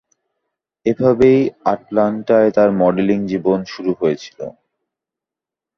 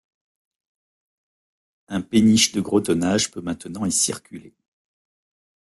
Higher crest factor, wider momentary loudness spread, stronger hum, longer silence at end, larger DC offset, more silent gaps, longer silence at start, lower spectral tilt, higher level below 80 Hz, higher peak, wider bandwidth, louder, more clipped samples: second, 16 dB vs 22 dB; second, 11 LU vs 14 LU; neither; about the same, 1.3 s vs 1.2 s; neither; neither; second, 0.85 s vs 1.9 s; first, -8 dB/octave vs -3.5 dB/octave; first, -52 dBFS vs -58 dBFS; about the same, 0 dBFS vs -2 dBFS; second, 6.6 kHz vs 12.5 kHz; first, -16 LUFS vs -20 LUFS; neither